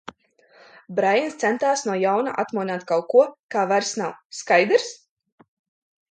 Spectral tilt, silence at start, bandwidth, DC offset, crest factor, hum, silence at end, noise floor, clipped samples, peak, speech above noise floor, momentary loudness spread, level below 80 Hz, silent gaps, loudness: -3.5 dB/octave; 0.9 s; 9.4 kHz; under 0.1%; 20 dB; none; 1.15 s; -57 dBFS; under 0.1%; -4 dBFS; 35 dB; 11 LU; -76 dBFS; 3.39-3.49 s, 4.25-4.30 s; -22 LUFS